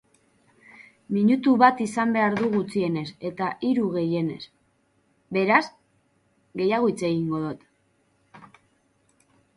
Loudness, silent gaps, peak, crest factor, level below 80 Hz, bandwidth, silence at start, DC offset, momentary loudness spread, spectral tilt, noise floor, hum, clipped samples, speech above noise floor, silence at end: -24 LUFS; none; -4 dBFS; 22 dB; -66 dBFS; 11.5 kHz; 0.8 s; under 0.1%; 14 LU; -6.5 dB/octave; -67 dBFS; none; under 0.1%; 44 dB; 1.1 s